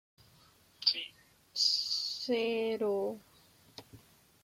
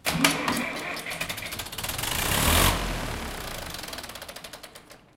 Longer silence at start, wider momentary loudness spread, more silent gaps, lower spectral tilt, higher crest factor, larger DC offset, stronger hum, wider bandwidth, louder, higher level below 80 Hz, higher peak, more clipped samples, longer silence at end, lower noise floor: first, 0.8 s vs 0.05 s; first, 24 LU vs 18 LU; neither; about the same, -2 dB/octave vs -3 dB/octave; about the same, 24 dB vs 26 dB; neither; neither; about the same, 16.5 kHz vs 17 kHz; second, -32 LUFS vs -27 LUFS; second, -78 dBFS vs -38 dBFS; second, -14 dBFS vs -4 dBFS; neither; first, 0.45 s vs 0.2 s; first, -64 dBFS vs -49 dBFS